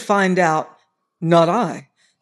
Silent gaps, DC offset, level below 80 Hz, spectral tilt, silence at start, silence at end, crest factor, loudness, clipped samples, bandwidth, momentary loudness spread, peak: none; under 0.1%; -74 dBFS; -6 dB/octave; 0 s; 0.4 s; 16 dB; -18 LUFS; under 0.1%; 12 kHz; 16 LU; -2 dBFS